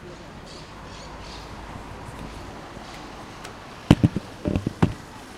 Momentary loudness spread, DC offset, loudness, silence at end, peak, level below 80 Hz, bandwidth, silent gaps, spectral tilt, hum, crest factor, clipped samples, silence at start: 20 LU; under 0.1%; -27 LUFS; 0 s; 0 dBFS; -42 dBFS; 15.5 kHz; none; -7 dB/octave; none; 28 dB; under 0.1%; 0 s